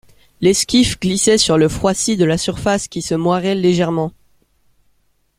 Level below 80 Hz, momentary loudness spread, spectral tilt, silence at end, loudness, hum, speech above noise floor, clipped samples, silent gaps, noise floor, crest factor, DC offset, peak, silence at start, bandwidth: -42 dBFS; 6 LU; -4.5 dB/octave; 1.3 s; -16 LUFS; none; 45 dB; under 0.1%; none; -60 dBFS; 16 dB; under 0.1%; 0 dBFS; 0.4 s; 16 kHz